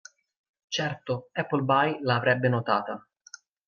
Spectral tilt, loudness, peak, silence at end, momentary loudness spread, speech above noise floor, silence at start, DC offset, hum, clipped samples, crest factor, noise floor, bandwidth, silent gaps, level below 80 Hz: -5.5 dB/octave; -26 LUFS; -8 dBFS; 0.7 s; 10 LU; 25 dB; 0.7 s; under 0.1%; none; under 0.1%; 20 dB; -51 dBFS; 7 kHz; none; -72 dBFS